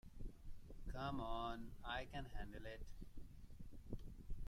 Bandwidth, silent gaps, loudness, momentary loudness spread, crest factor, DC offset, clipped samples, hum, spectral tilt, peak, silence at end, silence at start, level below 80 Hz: 14 kHz; none; -52 LUFS; 15 LU; 16 dB; under 0.1%; under 0.1%; none; -6 dB/octave; -32 dBFS; 0 s; 0.05 s; -54 dBFS